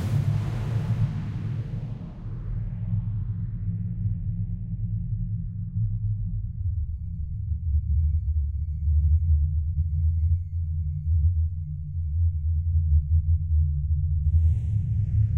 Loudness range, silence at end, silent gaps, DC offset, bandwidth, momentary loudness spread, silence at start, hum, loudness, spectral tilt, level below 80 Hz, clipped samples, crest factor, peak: 6 LU; 0 s; none; under 0.1%; 3.4 kHz; 9 LU; 0 s; none; -27 LUFS; -9.5 dB/octave; -28 dBFS; under 0.1%; 14 dB; -10 dBFS